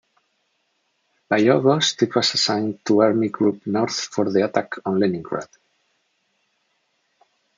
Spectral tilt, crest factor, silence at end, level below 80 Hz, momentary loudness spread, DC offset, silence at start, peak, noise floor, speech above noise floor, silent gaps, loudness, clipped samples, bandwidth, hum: -4.5 dB/octave; 20 dB; 2.15 s; -70 dBFS; 8 LU; under 0.1%; 1.3 s; -2 dBFS; -70 dBFS; 50 dB; none; -20 LUFS; under 0.1%; 9.4 kHz; none